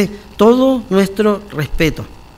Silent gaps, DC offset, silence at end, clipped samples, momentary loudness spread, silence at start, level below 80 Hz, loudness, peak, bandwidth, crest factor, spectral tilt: none; under 0.1%; 0.25 s; 0.3%; 10 LU; 0 s; -32 dBFS; -14 LUFS; 0 dBFS; 16 kHz; 14 dB; -6.5 dB/octave